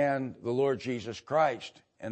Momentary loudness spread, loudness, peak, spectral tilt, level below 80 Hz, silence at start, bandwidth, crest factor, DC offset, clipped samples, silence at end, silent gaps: 14 LU; -31 LUFS; -14 dBFS; -6 dB/octave; -72 dBFS; 0 s; 8.8 kHz; 16 dB; under 0.1%; under 0.1%; 0 s; none